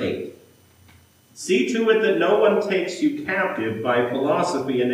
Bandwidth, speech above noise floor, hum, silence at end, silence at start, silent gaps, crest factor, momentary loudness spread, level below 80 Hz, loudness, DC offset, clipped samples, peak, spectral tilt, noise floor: 15.5 kHz; 32 dB; none; 0 s; 0 s; none; 16 dB; 8 LU; -72 dBFS; -21 LUFS; under 0.1%; under 0.1%; -6 dBFS; -5 dB/octave; -53 dBFS